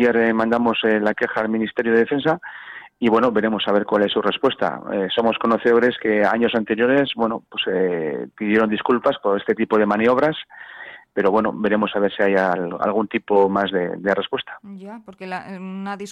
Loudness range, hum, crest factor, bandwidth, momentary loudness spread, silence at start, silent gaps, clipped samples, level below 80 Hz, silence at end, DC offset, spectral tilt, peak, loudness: 2 LU; none; 14 dB; 8 kHz; 14 LU; 0 s; none; under 0.1%; -60 dBFS; 0 s; under 0.1%; -6.5 dB/octave; -6 dBFS; -20 LUFS